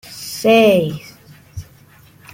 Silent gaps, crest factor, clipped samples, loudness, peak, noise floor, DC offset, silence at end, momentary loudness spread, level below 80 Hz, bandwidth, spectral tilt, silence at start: none; 16 dB; under 0.1%; -14 LUFS; -2 dBFS; -47 dBFS; under 0.1%; 0.7 s; 25 LU; -50 dBFS; 17 kHz; -5 dB/octave; 0.1 s